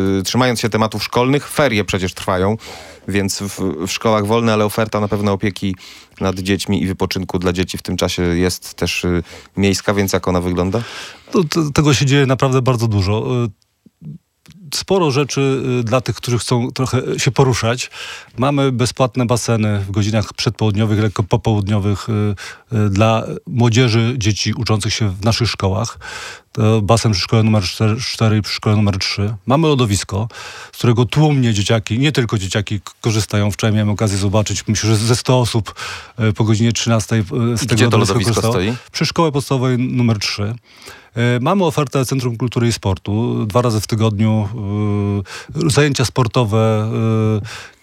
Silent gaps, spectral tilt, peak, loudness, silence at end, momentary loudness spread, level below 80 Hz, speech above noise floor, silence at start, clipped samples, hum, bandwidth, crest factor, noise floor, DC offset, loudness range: none; -5.5 dB/octave; 0 dBFS; -17 LUFS; 0.15 s; 8 LU; -46 dBFS; 22 dB; 0 s; under 0.1%; none; 16 kHz; 16 dB; -38 dBFS; under 0.1%; 2 LU